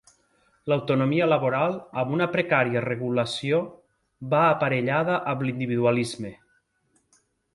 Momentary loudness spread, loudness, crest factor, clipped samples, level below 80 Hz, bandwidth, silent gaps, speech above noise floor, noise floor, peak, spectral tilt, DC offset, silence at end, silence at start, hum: 9 LU; -24 LUFS; 18 dB; under 0.1%; -64 dBFS; 11.5 kHz; none; 45 dB; -69 dBFS; -6 dBFS; -6.5 dB/octave; under 0.1%; 1.2 s; 0.65 s; none